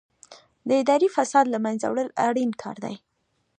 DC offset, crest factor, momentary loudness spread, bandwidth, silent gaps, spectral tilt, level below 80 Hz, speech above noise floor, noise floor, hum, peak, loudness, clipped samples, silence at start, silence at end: under 0.1%; 20 dB; 15 LU; 10 kHz; none; -4.5 dB/octave; -76 dBFS; 29 dB; -51 dBFS; none; -4 dBFS; -23 LUFS; under 0.1%; 0.3 s; 0.65 s